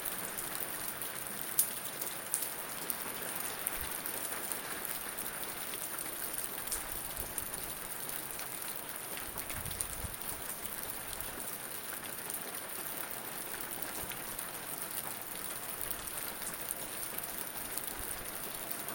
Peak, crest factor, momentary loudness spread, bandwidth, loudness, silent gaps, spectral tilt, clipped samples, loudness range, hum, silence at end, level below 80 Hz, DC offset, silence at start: -2 dBFS; 36 dB; 3 LU; 17 kHz; -37 LUFS; none; -1.5 dB/octave; under 0.1%; 3 LU; none; 0 s; -60 dBFS; under 0.1%; 0 s